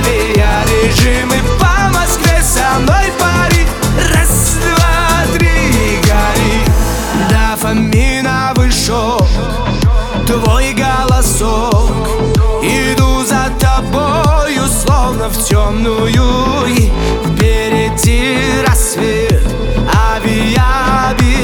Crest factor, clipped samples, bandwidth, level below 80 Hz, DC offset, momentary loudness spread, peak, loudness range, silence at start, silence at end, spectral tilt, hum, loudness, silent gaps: 10 dB; under 0.1%; 19.5 kHz; -14 dBFS; under 0.1%; 3 LU; 0 dBFS; 2 LU; 0 s; 0 s; -4.5 dB/octave; none; -11 LUFS; none